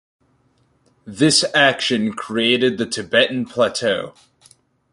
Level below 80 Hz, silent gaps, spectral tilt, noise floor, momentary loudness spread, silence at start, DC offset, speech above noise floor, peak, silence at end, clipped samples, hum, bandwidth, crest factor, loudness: -60 dBFS; none; -3 dB/octave; -61 dBFS; 10 LU; 1.05 s; under 0.1%; 43 dB; -2 dBFS; 0.8 s; under 0.1%; none; 11.5 kHz; 18 dB; -17 LUFS